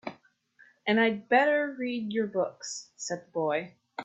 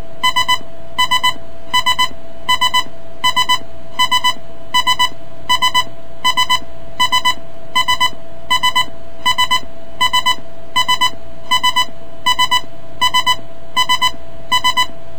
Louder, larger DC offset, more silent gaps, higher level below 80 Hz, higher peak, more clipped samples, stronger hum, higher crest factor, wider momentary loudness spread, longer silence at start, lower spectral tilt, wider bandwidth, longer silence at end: second, -29 LUFS vs -15 LUFS; second, under 0.1% vs 10%; neither; second, -76 dBFS vs -46 dBFS; second, -10 dBFS vs 0 dBFS; neither; neither; about the same, 20 dB vs 16 dB; first, 14 LU vs 7 LU; about the same, 0.05 s vs 0 s; first, -4 dB/octave vs -0.5 dB/octave; second, 8.4 kHz vs over 20 kHz; about the same, 0 s vs 0 s